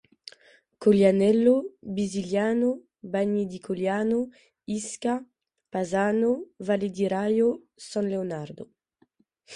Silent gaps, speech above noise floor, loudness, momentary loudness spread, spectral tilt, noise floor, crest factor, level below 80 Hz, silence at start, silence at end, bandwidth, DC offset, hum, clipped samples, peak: none; 42 dB; -26 LUFS; 17 LU; -6.5 dB/octave; -67 dBFS; 18 dB; -66 dBFS; 0.8 s; 0 s; 11.5 kHz; under 0.1%; none; under 0.1%; -8 dBFS